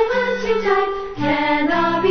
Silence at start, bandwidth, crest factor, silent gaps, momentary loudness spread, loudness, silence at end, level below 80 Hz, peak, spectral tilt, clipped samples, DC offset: 0 s; 6.6 kHz; 14 dB; none; 4 LU; -19 LUFS; 0 s; -44 dBFS; -4 dBFS; -6 dB/octave; under 0.1%; under 0.1%